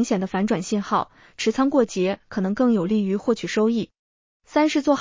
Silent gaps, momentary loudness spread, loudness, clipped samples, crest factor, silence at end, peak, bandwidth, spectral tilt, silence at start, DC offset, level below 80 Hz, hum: 3.99-4.40 s; 6 LU; -22 LUFS; under 0.1%; 16 dB; 0 s; -6 dBFS; 7.6 kHz; -5.5 dB/octave; 0 s; under 0.1%; -60 dBFS; none